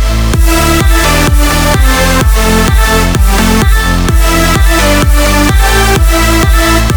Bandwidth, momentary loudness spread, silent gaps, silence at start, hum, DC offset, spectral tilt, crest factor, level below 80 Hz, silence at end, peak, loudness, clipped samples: over 20 kHz; 2 LU; none; 0 s; none; under 0.1%; -4.5 dB/octave; 6 dB; -10 dBFS; 0 s; 0 dBFS; -8 LUFS; 0.3%